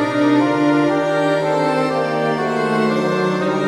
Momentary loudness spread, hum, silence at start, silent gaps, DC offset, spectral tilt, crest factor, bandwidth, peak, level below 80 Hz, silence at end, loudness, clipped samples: 3 LU; none; 0 s; none; under 0.1%; -6.5 dB/octave; 12 dB; 11.5 kHz; -4 dBFS; -60 dBFS; 0 s; -17 LUFS; under 0.1%